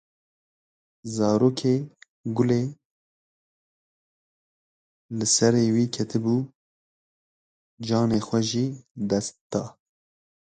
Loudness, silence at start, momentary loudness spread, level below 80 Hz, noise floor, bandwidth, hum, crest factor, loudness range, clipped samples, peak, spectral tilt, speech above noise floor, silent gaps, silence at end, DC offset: -24 LUFS; 1.05 s; 16 LU; -62 dBFS; under -90 dBFS; 9.4 kHz; none; 20 dB; 4 LU; under 0.1%; -6 dBFS; -5 dB/octave; over 67 dB; 2.09-2.24 s, 2.85-5.09 s, 6.55-7.77 s, 8.91-8.95 s, 9.41-9.50 s; 0.7 s; under 0.1%